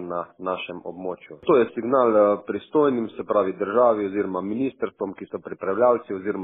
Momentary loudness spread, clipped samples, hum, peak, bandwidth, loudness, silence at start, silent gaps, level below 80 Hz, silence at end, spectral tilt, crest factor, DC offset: 13 LU; under 0.1%; none; -6 dBFS; 3.9 kHz; -23 LUFS; 0 s; none; -66 dBFS; 0 s; -5.5 dB/octave; 18 dB; under 0.1%